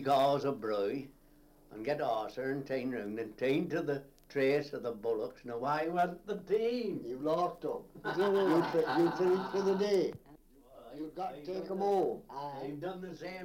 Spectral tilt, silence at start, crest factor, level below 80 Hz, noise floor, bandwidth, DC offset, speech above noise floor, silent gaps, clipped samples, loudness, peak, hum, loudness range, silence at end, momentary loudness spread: -6.5 dB/octave; 0 s; 16 dB; -66 dBFS; -62 dBFS; 16.5 kHz; under 0.1%; 28 dB; none; under 0.1%; -34 LUFS; -18 dBFS; none; 5 LU; 0 s; 12 LU